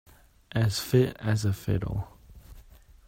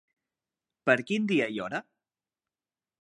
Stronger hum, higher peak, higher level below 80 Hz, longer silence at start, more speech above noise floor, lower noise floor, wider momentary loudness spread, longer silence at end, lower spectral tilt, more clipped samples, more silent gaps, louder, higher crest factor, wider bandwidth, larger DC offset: neither; second, -10 dBFS vs -6 dBFS; first, -48 dBFS vs -78 dBFS; second, 0.55 s vs 0.85 s; second, 26 dB vs over 62 dB; second, -52 dBFS vs under -90 dBFS; about the same, 10 LU vs 10 LU; second, 0.5 s vs 1.2 s; about the same, -6 dB/octave vs -5.5 dB/octave; neither; neither; about the same, -28 LUFS vs -28 LUFS; second, 20 dB vs 26 dB; first, 16 kHz vs 11 kHz; neither